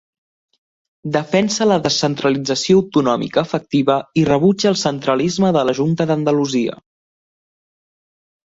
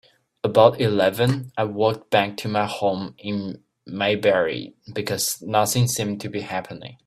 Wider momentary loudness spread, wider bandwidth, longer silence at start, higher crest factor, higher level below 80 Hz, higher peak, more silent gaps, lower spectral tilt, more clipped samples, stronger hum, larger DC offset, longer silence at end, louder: second, 5 LU vs 13 LU; second, 8 kHz vs 16 kHz; first, 1.05 s vs 0.45 s; second, 16 dB vs 22 dB; about the same, -54 dBFS vs -58 dBFS; about the same, -2 dBFS vs 0 dBFS; neither; about the same, -5.5 dB/octave vs -4.5 dB/octave; neither; neither; neither; first, 1.7 s vs 0.15 s; first, -17 LUFS vs -22 LUFS